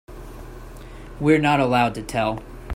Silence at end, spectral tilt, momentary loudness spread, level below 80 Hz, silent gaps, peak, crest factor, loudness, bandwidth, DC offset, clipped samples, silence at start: 0 s; -6 dB/octave; 23 LU; -40 dBFS; none; -4 dBFS; 18 dB; -20 LUFS; 16 kHz; under 0.1%; under 0.1%; 0.1 s